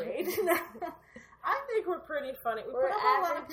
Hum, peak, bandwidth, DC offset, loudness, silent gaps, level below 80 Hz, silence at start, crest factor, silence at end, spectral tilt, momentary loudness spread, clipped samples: none; -12 dBFS; 17 kHz; under 0.1%; -31 LUFS; none; -68 dBFS; 0 s; 20 dB; 0 s; -3.5 dB/octave; 14 LU; under 0.1%